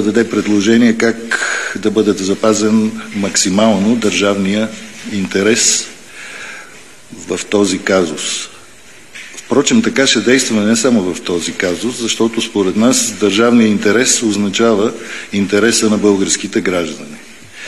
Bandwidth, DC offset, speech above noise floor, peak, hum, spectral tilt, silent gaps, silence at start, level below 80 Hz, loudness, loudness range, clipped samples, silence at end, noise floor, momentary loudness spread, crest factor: 13 kHz; 0.9%; 27 dB; 0 dBFS; none; -3.5 dB/octave; none; 0 s; -54 dBFS; -13 LUFS; 4 LU; under 0.1%; 0 s; -40 dBFS; 17 LU; 14 dB